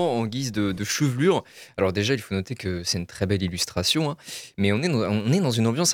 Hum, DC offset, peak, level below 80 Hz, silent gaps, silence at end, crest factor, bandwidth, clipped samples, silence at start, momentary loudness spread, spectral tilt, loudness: none; under 0.1%; -6 dBFS; -54 dBFS; none; 0 s; 18 dB; 17.5 kHz; under 0.1%; 0 s; 7 LU; -4.5 dB/octave; -24 LUFS